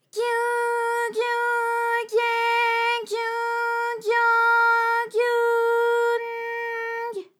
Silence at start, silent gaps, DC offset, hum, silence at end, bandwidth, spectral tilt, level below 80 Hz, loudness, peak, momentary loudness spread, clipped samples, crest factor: 0.15 s; none; under 0.1%; none; 0.15 s; 16 kHz; -0.5 dB/octave; under -90 dBFS; -22 LUFS; -10 dBFS; 9 LU; under 0.1%; 12 dB